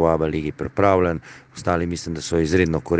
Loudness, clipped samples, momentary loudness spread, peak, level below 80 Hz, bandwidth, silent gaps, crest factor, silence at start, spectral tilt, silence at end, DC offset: -21 LUFS; under 0.1%; 10 LU; 0 dBFS; -44 dBFS; 9.6 kHz; none; 20 dB; 0 s; -6 dB/octave; 0 s; under 0.1%